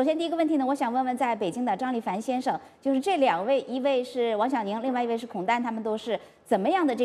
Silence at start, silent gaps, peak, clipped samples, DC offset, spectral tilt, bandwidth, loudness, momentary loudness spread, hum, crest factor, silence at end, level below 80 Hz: 0 s; none; -12 dBFS; under 0.1%; under 0.1%; -5.5 dB/octave; 13.5 kHz; -27 LUFS; 6 LU; none; 16 dB; 0 s; -72 dBFS